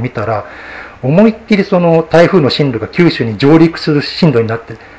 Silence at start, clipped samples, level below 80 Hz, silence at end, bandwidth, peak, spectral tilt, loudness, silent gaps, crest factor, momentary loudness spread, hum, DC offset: 0 s; 0.7%; -42 dBFS; 0.2 s; 8 kHz; 0 dBFS; -7.5 dB/octave; -11 LUFS; none; 10 dB; 12 LU; none; under 0.1%